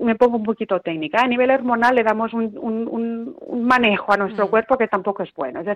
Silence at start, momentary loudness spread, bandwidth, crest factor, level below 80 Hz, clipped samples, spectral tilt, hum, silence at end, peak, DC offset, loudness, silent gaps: 0 s; 10 LU; 9.8 kHz; 16 dB; -58 dBFS; under 0.1%; -6.5 dB/octave; none; 0 s; -2 dBFS; under 0.1%; -19 LUFS; none